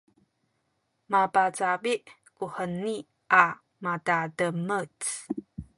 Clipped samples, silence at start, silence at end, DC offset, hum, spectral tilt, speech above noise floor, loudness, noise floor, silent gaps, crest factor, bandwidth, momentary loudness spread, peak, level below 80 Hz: under 0.1%; 1.1 s; 0.15 s; under 0.1%; none; -4 dB/octave; 49 dB; -27 LUFS; -76 dBFS; none; 26 dB; 11.5 kHz; 15 LU; -4 dBFS; -62 dBFS